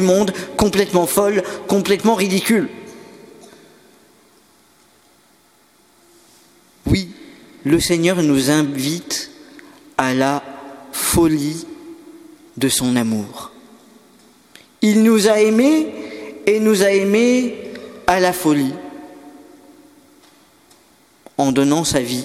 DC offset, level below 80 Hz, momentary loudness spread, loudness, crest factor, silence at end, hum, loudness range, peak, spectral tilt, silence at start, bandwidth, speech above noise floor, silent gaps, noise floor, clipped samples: under 0.1%; -44 dBFS; 19 LU; -17 LUFS; 18 dB; 0 s; none; 9 LU; 0 dBFS; -4.5 dB/octave; 0 s; 17 kHz; 38 dB; none; -54 dBFS; under 0.1%